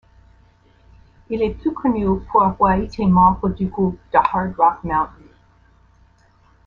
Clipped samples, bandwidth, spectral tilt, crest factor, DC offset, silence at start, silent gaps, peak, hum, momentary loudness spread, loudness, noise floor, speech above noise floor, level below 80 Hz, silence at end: under 0.1%; 5.2 kHz; -9.5 dB/octave; 18 dB; under 0.1%; 1.3 s; none; -2 dBFS; none; 8 LU; -18 LUFS; -54 dBFS; 36 dB; -38 dBFS; 1.6 s